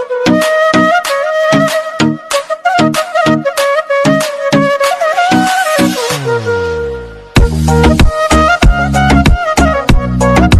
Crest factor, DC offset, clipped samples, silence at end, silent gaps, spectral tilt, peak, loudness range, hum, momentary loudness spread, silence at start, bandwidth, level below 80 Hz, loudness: 10 dB; under 0.1%; 1%; 0 s; none; -5.5 dB/octave; 0 dBFS; 2 LU; none; 6 LU; 0 s; 14 kHz; -18 dBFS; -11 LUFS